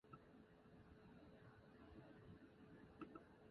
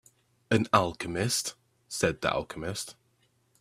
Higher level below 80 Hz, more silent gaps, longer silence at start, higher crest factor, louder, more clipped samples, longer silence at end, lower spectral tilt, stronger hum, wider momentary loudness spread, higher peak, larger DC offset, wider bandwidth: second, -76 dBFS vs -58 dBFS; neither; second, 0.05 s vs 0.5 s; about the same, 22 dB vs 26 dB; second, -65 LUFS vs -29 LUFS; neither; second, 0 s vs 0.7 s; first, -6 dB/octave vs -4 dB/octave; neither; second, 7 LU vs 13 LU; second, -42 dBFS vs -6 dBFS; neither; second, 5.4 kHz vs 15.5 kHz